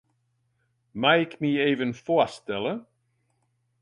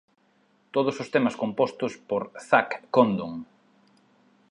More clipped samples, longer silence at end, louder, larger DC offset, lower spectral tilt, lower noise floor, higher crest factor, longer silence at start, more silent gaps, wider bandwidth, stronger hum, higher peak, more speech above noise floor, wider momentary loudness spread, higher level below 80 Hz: neither; about the same, 1 s vs 1.05 s; about the same, -25 LUFS vs -26 LUFS; neither; about the same, -6 dB/octave vs -6 dB/octave; first, -72 dBFS vs -65 dBFS; about the same, 20 dB vs 22 dB; first, 0.95 s vs 0.75 s; neither; about the same, 11 kHz vs 10.5 kHz; neither; about the same, -6 dBFS vs -4 dBFS; first, 48 dB vs 40 dB; about the same, 10 LU vs 9 LU; about the same, -68 dBFS vs -70 dBFS